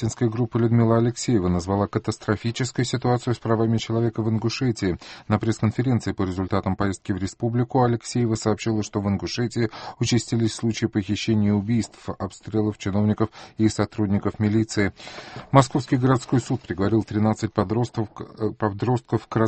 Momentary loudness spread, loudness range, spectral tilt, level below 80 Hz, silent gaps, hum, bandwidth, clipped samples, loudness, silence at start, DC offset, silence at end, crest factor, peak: 7 LU; 2 LU; -6.5 dB/octave; -50 dBFS; none; none; 8.8 kHz; under 0.1%; -24 LUFS; 0 s; under 0.1%; 0 s; 22 dB; -2 dBFS